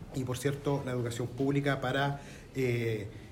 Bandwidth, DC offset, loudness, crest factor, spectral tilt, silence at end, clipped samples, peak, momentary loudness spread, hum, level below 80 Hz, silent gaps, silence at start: 16 kHz; under 0.1%; -33 LUFS; 16 dB; -6 dB/octave; 0 s; under 0.1%; -16 dBFS; 6 LU; none; -56 dBFS; none; 0 s